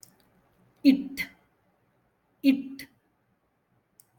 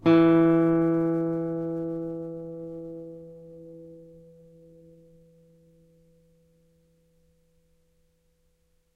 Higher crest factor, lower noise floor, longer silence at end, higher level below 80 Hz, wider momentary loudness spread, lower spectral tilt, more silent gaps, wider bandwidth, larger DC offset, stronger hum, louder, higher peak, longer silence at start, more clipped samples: about the same, 22 dB vs 18 dB; first, -72 dBFS vs -68 dBFS; second, 1.35 s vs 4.9 s; second, -70 dBFS vs -62 dBFS; second, 20 LU vs 27 LU; second, -5 dB/octave vs -9.5 dB/octave; neither; first, 17.5 kHz vs 4.6 kHz; neither; neither; about the same, -26 LUFS vs -25 LUFS; about the same, -8 dBFS vs -10 dBFS; first, 0.85 s vs 0.05 s; neither